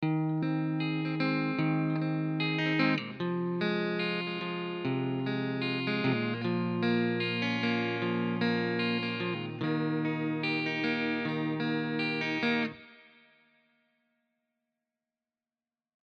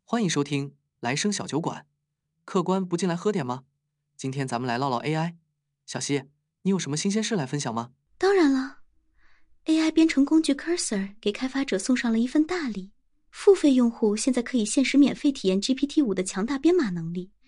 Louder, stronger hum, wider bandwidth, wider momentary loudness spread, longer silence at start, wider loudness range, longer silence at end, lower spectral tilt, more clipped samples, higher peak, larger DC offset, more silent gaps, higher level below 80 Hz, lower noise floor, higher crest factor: second, -31 LUFS vs -25 LUFS; neither; second, 6.6 kHz vs 11.5 kHz; second, 4 LU vs 13 LU; about the same, 0 s vs 0.1 s; about the same, 4 LU vs 6 LU; first, 3.05 s vs 0.2 s; first, -7.5 dB/octave vs -5 dB/octave; neither; second, -14 dBFS vs -8 dBFS; neither; neither; second, -78 dBFS vs -58 dBFS; first, under -90 dBFS vs -78 dBFS; about the same, 18 dB vs 18 dB